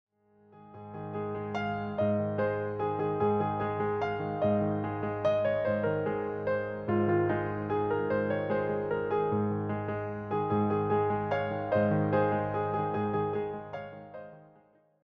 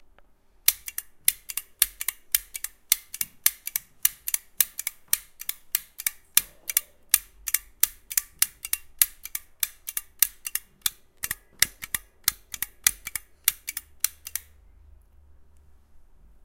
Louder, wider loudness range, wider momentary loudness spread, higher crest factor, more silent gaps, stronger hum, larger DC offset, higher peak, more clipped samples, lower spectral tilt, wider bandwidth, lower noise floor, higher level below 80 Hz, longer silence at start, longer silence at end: second, -31 LUFS vs -26 LUFS; about the same, 2 LU vs 3 LU; about the same, 9 LU vs 11 LU; second, 16 dB vs 30 dB; neither; neither; neither; second, -16 dBFS vs 0 dBFS; neither; first, -7 dB/octave vs 2.5 dB/octave; second, 6.2 kHz vs 17.5 kHz; first, -63 dBFS vs -56 dBFS; second, -62 dBFS vs -56 dBFS; second, 0.55 s vs 0.7 s; first, 0.6 s vs 0.45 s